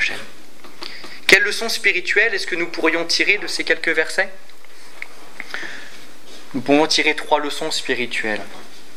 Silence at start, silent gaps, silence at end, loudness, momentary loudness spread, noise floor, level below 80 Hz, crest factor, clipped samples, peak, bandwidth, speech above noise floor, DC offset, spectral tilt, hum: 0 s; none; 0.15 s; -18 LUFS; 21 LU; -45 dBFS; -64 dBFS; 22 dB; under 0.1%; 0 dBFS; 16 kHz; 25 dB; 5%; -2 dB/octave; none